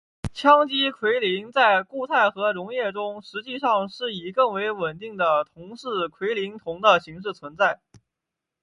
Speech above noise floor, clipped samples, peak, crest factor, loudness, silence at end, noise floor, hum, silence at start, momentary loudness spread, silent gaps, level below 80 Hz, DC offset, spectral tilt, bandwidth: 62 dB; under 0.1%; -2 dBFS; 22 dB; -23 LUFS; 0.85 s; -85 dBFS; none; 0.25 s; 14 LU; none; -56 dBFS; under 0.1%; -5 dB/octave; 11.5 kHz